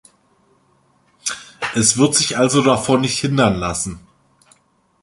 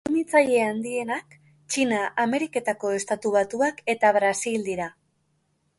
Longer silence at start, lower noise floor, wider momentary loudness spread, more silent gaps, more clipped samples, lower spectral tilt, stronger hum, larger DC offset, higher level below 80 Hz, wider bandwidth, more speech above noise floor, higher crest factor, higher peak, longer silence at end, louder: first, 1.25 s vs 0.05 s; second, -59 dBFS vs -70 dBFS; about the same, 12 LU vs 10 LU; neither; neither; about the same, -3.5 dB/octave vs -3.5 dB/octave; neither; neither; first, -46 dBFS vs -66 dBFS; about the same, 11.5 kHz vs 11.5 kHz; about the same, 43 dB vs 46 dB; about the same, 20 dB vs 20 dB; first, 0 dBFS vs -6 dBFS; first, 1.05 s vs 0.9 s; first, -17 LUFS vs -24 LUFS